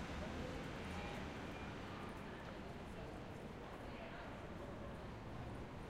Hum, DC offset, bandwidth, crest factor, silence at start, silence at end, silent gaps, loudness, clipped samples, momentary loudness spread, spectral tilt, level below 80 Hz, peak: none; under 0.1%; 16 kHz; 14 dB; 0 s; 0 s; none; -50 LUFS; under 0.1%; 4 LU; -6 dB/octave; -58 dBFS; -34 dBFS